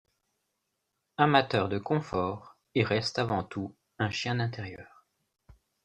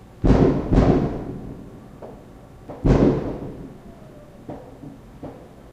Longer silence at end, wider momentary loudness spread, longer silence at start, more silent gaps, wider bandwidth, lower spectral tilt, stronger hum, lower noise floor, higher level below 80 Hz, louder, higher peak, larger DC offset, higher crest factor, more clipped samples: first, 1 s vs 0.25 s; second, 18 LU vs 25 LU; first, 1.2 s vs 0.2 s; neither; first, 10.5 kHz vs 8.4 kHz; second, -6 dB/octave vs -9 dB/octave; neither; first, -81 dBFS vs -43 dBFS; second, -62 dBFS vs -30 dBFS; second, -29 LUFS vs -20 LUFS; second, -8 dBFS vs -2 dBFS; neither; about the same, 24 dB vs 20 dB; neither